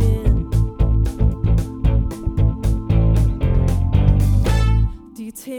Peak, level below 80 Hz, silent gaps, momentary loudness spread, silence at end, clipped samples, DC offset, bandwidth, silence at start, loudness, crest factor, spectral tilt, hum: -2 dBFS; -20 dBFS; none; 6 LU; 0 s; under 0.1%; under 0.1%; 13 kHz; 0 s; -19 LUFS; 14 dB; -8 dB/octave; none